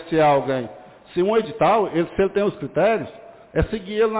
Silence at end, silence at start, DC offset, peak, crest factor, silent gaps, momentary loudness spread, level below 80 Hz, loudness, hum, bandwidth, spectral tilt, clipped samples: 0 s; 0 s; under 0.1%; -8 dBFS; 12 dB; none; 9 LU; -42 dBFS; -21 LUFS; none; 4 kHz; -10.5 dB/octave; under 0.1%